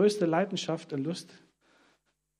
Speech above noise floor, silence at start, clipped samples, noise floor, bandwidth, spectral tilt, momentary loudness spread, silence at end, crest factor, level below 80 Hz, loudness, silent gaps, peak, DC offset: 43 dB; 0 s; under 0.1%; -74 dBFS; 12.5 kHz; -5.5 dB/octave; 13 LU; 1.15 s; 18 dB; -80 dBFS; -31 LUFS; none; -12 dBFS; under 0.1%